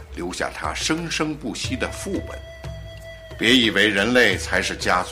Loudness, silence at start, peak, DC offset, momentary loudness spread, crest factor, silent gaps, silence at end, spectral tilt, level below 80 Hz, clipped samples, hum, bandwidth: -20 LUFS; 0 s; -4 dBFS; under 0.1%; 20 LU; 18 dB; none; 0 s; -3.5 dB/octave; -40 dBFS; under 0.1%; none; 16 kHz